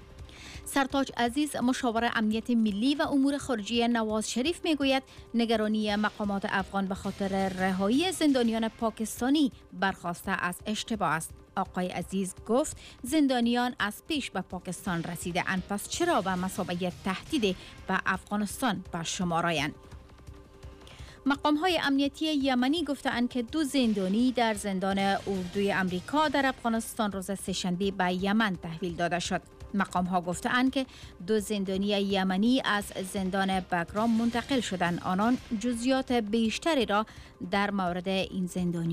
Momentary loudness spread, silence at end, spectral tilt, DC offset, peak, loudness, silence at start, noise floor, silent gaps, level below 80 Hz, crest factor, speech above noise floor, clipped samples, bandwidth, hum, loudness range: 7 LU; 0 s; -4.5 dB/octave; under 0.1%; -16 dBFS; -29 LUFS; 0 s; -49 dBFS; none; -54 dBFS; 14 dB; 20 dB; under 0.1%; 15.5 kHz; none; 3 LU